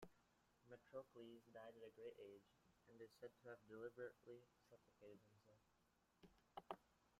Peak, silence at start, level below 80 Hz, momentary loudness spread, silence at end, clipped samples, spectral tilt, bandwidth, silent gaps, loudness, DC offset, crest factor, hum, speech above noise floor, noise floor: -34 dBFS; 0 s; -90 dBFS; 9 LU; 0 s; under 0.1%; -5.5 dB/octave; 14 kHz; none; -62 LUFS; under 0.1%; 28 dB; none; 22 dB; -83 dBFS